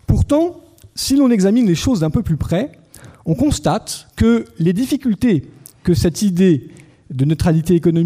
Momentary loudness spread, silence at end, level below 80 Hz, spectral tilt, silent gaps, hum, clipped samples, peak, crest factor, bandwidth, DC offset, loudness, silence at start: 9 LU; 0 s; -34 dBFS; -6.5 dB/octave; none; none; under 0.1%; -4 dBFS; 12 dB; 16 kHz; under 0.1%; -16 LUFS; 0.1 s